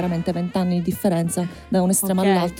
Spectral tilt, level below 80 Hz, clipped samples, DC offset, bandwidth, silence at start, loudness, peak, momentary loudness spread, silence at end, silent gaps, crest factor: -5.5 dB/octave; -48 dBFS; under 0.1%; under 0.1%; 17 kHz; 0 s; -21 LUFS; -6 dBFS; 5 LU; 0 s; none; 14 dB